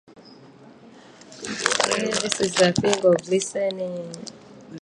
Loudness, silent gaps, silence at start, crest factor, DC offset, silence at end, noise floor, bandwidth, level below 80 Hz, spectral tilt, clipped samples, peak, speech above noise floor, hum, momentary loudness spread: -22 LUFS; none; 0.1 s; 24 dB; under 0.1%; 0 s; -48 dBFS; 11.5 kHz; -58 dBFS; -3.5 dB/octave; under 0.1%; 0 dBFS; 25 dB; none; 17 LU